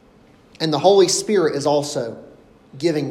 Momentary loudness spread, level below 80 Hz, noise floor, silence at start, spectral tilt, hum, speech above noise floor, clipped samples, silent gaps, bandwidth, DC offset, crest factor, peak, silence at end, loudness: 12 LU; -60 dBFS; -51 dBFS; 0.6 s; -4 dB/octave; none; 33 dB; under 0.1%; none; 13.5 kHz; under 0.1%; 18 dB; 0 dBFS; 0 s; -18 LUFS